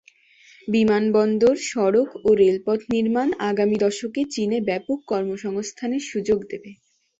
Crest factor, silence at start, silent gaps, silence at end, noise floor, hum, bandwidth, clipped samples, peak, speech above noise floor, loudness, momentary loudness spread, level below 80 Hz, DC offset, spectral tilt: 14 dB; 0.65 s; none; 0.45 s; -53 dBFS; none; 8 kHz; under 0.1%; -6 dBFS; 32 dB; -22 LUFS; 9 LU; -58 dBFS; under 0.1%; -5.5 dB/octave